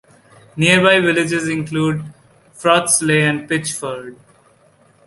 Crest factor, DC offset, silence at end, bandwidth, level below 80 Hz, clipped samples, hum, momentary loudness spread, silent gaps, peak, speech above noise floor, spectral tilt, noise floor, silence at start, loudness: 18 dB; under 0.1%; 0.95 s; 12 kHz; -56 dBFS; under 0.1%; none; 17 LU; none; 0 dBFS; 37 dB; -4 dB/octave; -53 dBFS; 0.55 s; -16 LUFS